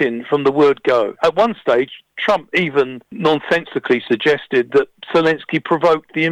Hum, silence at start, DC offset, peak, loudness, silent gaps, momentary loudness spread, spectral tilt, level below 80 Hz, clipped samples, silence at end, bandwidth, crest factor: none; 0 s; under 0.1%; -2 dBFS; -17 LUFS; none; 5 LU; -6 dB/octave; -56 dBFS; under 0.1%; 0 s; 9.8 kHz; 14 dB